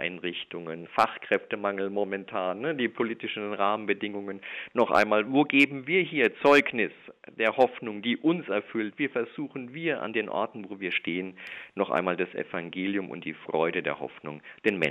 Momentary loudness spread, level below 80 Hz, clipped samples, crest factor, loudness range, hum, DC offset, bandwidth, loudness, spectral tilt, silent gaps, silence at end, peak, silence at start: 14 LU; -74 dBFS; under 0.1%; 20 dB; 7 LU; none; under 0.1%; 13 kHz; -28 LUFS; -6 dB/octave; none; 0 s; -8 dBFS; 0 s